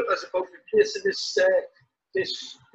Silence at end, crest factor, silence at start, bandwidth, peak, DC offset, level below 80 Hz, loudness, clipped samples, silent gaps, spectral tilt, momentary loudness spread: 0.2 s; 18 dB; 0 s; 8.2 kHz; -8 dBFS; under 0.1%; -68 dBFS; -25 LUFS; under 0.1%; none; -2.5 dB/octave; 9 LU